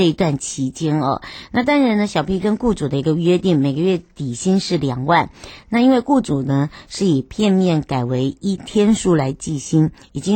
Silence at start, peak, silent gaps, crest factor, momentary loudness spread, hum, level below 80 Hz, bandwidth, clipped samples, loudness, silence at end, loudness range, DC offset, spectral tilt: 0 s; -4 dBFS; none; 14 dB; 8 LU; none; -44 dBFS; 16.5 kHz; under 0.1%; -18 LUFS; 0 s; 1 LU; under 0.1%; -6 dB/octave